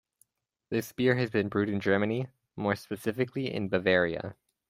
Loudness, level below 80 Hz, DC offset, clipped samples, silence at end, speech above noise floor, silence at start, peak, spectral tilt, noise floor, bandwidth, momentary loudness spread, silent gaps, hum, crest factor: -29 LUFS; -66 dBFS; under 0.1%; under 0.1%; 0.35 s; 41 dB; 0.7 s; -10 dBFS; -6.5 dB/octave; -70 dBFS; 16 kHz; 9 LU; none; none; 20 dB